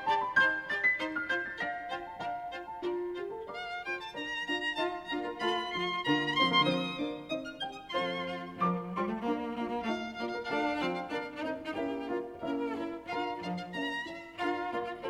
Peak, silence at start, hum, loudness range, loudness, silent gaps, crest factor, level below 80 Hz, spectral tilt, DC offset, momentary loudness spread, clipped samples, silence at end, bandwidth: -14 dBFS; 0 s; none; 5 LU; -33 LUFS; none; 20 dB; -66 dBFS; -5 dB/octave; under 0.1%; 11 LU; under 0.1%; 0 s; 14 kHz